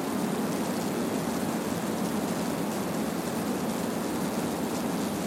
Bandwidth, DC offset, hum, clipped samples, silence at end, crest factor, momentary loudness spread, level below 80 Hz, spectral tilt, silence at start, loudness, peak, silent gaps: 16.5 kHz; under 0.1%; none; under 0.1%; 0 s; 12 dB; 1 LU; -58 dBFS; -5 dB/octave; 0 s; -30 LUFS; -18 dBFS; none